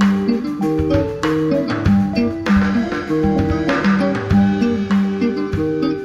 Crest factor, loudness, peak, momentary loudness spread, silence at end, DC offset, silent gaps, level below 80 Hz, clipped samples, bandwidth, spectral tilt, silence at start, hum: 14 dB; -17 LUFS; -2 dBFS; 4 LU; 0 s; under 0.1%; none; -34 dBFS; under 0.1%; 7.8 kHz; -7.5 dB/octave; 0 s; none